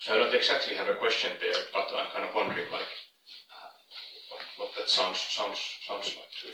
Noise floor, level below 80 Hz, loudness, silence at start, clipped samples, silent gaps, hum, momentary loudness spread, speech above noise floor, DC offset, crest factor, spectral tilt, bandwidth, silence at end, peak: -53 dBFS; -86 dBFS; -30 LUFS; 0 s; under 0.1%; none; none; 21 LU; 23 dB; under 0.1%; 20 dB; -1.5 dB/octave; 16.5 kHz; 0 s; -12 dBFS